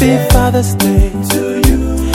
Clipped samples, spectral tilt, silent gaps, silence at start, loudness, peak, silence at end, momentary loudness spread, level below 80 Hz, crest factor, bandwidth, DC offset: 0.4%; -5.5 dB/octave; none; 0 s; -12 LUFS; 0 dBFS; 0 s; 4 LU; -16 dBFS; 10 dB; 18 kHz; under 0.1%